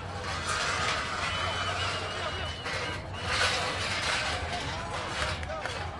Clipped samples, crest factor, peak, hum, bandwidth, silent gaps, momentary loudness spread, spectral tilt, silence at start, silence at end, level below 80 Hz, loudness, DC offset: under 0.1%; 18 dB; -14 dBFS; none; 11.5 kHz; none; 7 LU; -2.5 dB/octave; 0 s; 0 s; -48 dBFS; -30 LUFS; under 0.1%